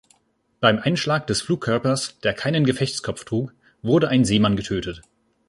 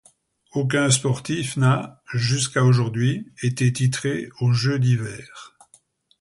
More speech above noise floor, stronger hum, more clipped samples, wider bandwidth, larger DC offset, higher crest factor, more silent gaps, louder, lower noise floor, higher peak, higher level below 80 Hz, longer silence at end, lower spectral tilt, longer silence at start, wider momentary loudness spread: first, 41 dB vs 37 dB; neither; neither; about the same, 11.5 kHz vs 11.5 kHz; neither; about the same, 20 dB vs 18 dB; neither; about the same, -22 LUFS vs -22 LUFS; first, -62 dBFS vs -58 dBFS; about the same, -2 dBFS vs -4 dBFS; first, -48 dBFS vs -56 dBFS; second, 0.5 s vs 0.75 s; about the same, -5 dB/octave vs -5 dB/octave; about the same, 0.6 s vs 0.55 s; about the same, 10 LU vs 8 LU